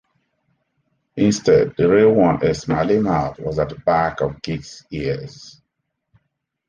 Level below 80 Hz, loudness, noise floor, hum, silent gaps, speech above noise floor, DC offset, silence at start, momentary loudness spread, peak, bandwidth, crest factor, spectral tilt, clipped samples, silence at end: -44 dBFS; -18 LUFS; -76 dBFS; none; none; 58 dB; under 0.1%; 1.15 s; 14 LU; -4 dBFS; 9.6 kHz; 16 dB; -6.5 dB/octave; under 0.1%; 1.2 s